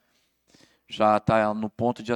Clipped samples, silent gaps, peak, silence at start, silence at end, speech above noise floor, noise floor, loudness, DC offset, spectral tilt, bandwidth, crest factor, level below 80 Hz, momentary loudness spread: under 0.1%; none; -8 dBFS; 0.9 s; 0 s; 45 dB; -69 dBFS; -24 LUFS; under 0.1%; -7 dB/octave; 11 kHz; 18 dB; -56 dBFS; 7 LU